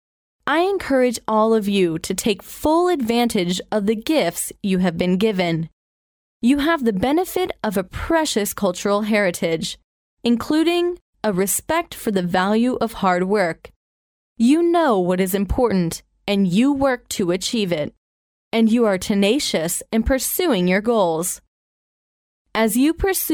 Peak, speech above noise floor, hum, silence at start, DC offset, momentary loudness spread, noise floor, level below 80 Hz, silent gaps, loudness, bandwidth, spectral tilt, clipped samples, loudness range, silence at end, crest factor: -4 dBFS; over 71 dB; none; 0.45 s; under 0.1%; 7 LU; under -90 dBFS; -42 dBFS; 5.73-6.40 s, 9.84-10.17 s, 11.01-11.13 s, 13.76-14.36 s, 17.98-18.51 s, 21.48-22.45 s; -20 LUFS; over 20 kHz; -4.5 dB/octave; under 0.1%; 2 LU; 0 s; 16 dB